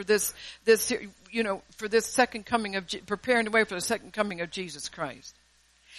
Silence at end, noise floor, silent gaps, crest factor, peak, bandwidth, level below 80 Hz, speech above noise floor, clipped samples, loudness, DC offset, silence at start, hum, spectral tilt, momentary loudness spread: 0 s; -63 dBFS; none; 20 dB; -10 dBFS; 13 kHz; -62 dBFS; 35 dB; under 0.1%; -28 LUFS; under 0.1%; 0 s; none; -2.5 dB/octave; 11 LU